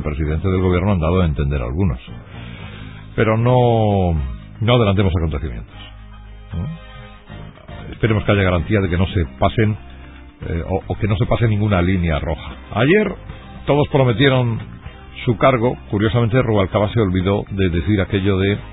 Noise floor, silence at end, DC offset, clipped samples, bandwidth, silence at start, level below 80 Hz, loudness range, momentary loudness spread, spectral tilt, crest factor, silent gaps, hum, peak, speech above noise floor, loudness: -37 dBFS; 0 s; under 0.1%; under 0.1%; 4 kHz; 0 s; -30 dBFS; 4 LU; 20 LU; -12.5 dB/octave; 16 dB; none; none; 0 dBFS; 21 dB; -18 LUFS